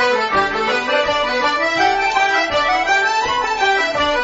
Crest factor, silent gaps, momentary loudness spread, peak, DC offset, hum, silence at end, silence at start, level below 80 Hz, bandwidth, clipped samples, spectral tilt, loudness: 14 dB; none; 2 LU; -4 dBFS; under 0.1%; none; 0 s; 0 s; -44 dBFS; 8 kHz; under 0.1%; -2 dB/octave; -16 LUFS